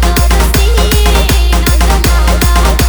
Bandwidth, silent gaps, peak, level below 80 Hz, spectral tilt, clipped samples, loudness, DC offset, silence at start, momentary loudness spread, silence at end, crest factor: over 20 kHz; none; 0 dBFS; -8 dBFS; -4.5 dB/octave; 0.2%; -10 LUFS; under 0.1%; 0 s; 1 LU; 0 s; 8 dB